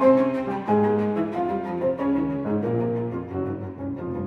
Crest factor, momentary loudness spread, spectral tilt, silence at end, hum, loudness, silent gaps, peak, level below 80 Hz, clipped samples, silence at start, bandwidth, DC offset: 18 dB; 9 LU; -9.5 dB/octave; 0 s; none; -25 LUFS; none; -6 dBFS; -54 dBFS; under 0.1%; 0 s; 6.2 kHz; under 0.1%